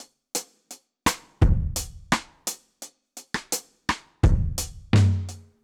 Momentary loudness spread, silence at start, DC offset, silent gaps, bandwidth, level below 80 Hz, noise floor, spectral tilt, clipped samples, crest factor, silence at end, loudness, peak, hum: 21 LU; 0 s; under 0.1%; none; 19 kHz; -30 dBFS; -49 dBFS; -4.5 dB/octave; under 0.1%; 18 dB; 0.25 s; -26 LUFS; -8 dBFS; none